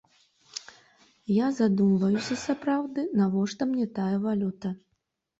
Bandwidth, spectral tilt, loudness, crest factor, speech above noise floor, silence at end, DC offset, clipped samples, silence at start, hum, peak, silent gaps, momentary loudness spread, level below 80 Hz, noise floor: 8 kHz; -6.5 dB/octave; -27 LUFS; 14 dB; 52 dB; 0.65 s; under 0.1%; under 0.1%; 0.55 s; none; -14 dBFS; none; 17 LU; -68 dBFS; -78 dBFS